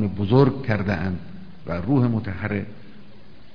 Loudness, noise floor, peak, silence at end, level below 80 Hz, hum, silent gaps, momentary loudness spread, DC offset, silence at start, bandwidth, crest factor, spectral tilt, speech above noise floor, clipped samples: -23 LUFS; -48 dBFS; -4 dBFS; 0.65 s; -48 dBFS; none; none; 17 LU; 2%; 0 s; 5.4 kHz; 18 dB; -10 dB/octave; 27 dB; under 0.1%